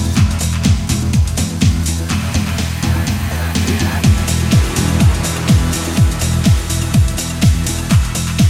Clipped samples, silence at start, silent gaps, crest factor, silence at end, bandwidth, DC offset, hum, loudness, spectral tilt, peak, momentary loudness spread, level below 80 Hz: under 0.1%; 0 s; none; 14 dB; 0 s; 16.5 kHz; under 0.1%; none; -15 LUFS; -5 dB/octave; 0 dBFS; 4 LU; -20 dBFS